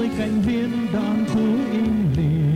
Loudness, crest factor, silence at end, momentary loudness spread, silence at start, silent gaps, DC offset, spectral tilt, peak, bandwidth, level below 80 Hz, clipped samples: -21 LUFS; 10 dB; 0 s; 3 LU; 0 s; none; under 0.1%; -8 dB/octave; -10 dBFS; 11 kHz; -40 dBFS; under 0.1%